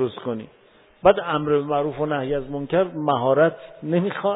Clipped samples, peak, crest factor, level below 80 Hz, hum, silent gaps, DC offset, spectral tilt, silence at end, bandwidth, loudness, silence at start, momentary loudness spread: under 0.1%; -2 dBFS; 20 dB; -52 dBFS; none; none; under 0.1%; -11 dB/octave; 0 s; 4 kHz; -22 LUFS; 0 s; 10 LU